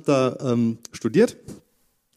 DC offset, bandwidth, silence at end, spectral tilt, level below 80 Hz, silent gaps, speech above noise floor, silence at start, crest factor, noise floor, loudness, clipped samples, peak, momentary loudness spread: under 0.1%; 13.5 kHz; 0.6 s; -6.5 dB/octave; -64 dBFS; none; 45 dB; 0.05 s; 18 dB; -67 dBFS; -22 LUFS; under 0.1%; -4 dBFS; 8 LU